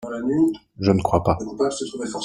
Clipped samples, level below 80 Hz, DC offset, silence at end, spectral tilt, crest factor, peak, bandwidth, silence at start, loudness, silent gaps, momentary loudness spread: under 0.1%; -46 dBFS; under 0.1%; 0 s; -6.5 dB/octave; 20 dB; -2 dBFS; 11.5 kHz; 0 s; -22 LUFS; none; 6 LU